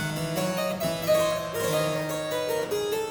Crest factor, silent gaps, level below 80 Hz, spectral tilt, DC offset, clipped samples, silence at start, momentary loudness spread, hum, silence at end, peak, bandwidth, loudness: 14 dB; none; -56 dBFS; -4.5 dB/octave; under 0.1%; under 0.1%; 0 s; 5 LU; none; 0 s; -12 dBFS; over 20 kHz; -27 LUFS